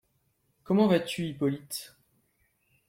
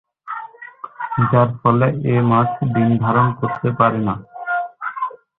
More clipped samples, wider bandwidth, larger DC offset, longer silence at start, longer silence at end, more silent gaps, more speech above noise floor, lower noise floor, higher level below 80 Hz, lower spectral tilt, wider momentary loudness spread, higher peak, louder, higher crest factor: neither; first, 16.5 kHz vs 4 kHz; neither; first, 0.7 s vs 0.25 s; first, 1.05 s vs 0.25 s; neither; first, 46 dB vs 21 dB; first, -73 dBFS vs -37 dBFS; second, -68 dBFS vs -50 dBFS; second, -6 dB/octave vs -12 dB/octave; about the same, 15 LU vs 15 LU; second, -12 dBFS vs -2 dBFS; second, -28 LUFS vs -18 LUFS; about the same, 20 dB vs 16 dB